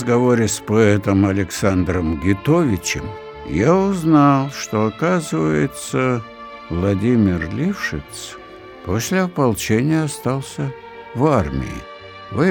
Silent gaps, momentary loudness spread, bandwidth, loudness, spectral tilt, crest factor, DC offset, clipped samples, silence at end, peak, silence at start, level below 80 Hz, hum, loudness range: none; 16 LU; 20 kHz; -18 LUFS; -6 dB/octave; 16 dB; under 0.1%; under 0.1%; 0 s; -2 dBFS; 0 s; -42 dBFS; none; 4 LU